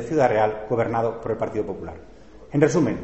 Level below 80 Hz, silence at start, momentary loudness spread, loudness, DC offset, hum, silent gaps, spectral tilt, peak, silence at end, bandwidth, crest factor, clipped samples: -50 dBFS; 0 s; 11 LU; -23 LUFS; 0.3%; none; none; -7 dB/octave; -4 dBFS; 0 s; 8.2 kHz; 20 dB; under 0.1%